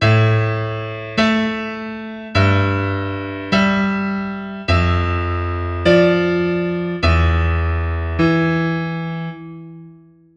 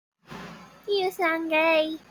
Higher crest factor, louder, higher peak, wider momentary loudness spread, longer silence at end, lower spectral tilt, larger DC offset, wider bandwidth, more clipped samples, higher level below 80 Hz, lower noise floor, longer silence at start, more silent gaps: about the same, 16 dB vs 16 dB; first, -18 LUFS vs -24 LUFS; first, 0 dBFS vs -12 dBFS; second, 11 LU vs 21 LU; first, 0.4 s vs 0.1 s; first, -7.5 dB/octave vs -4 dB/octave; neither; second, 7.4 kHz vs 19.5 kHz; neither; first, -30 dBFS vs -66 dBFS; about the same, -45 dBFS vs -44 dBFS; second, 0 s vs 0.3 s; neither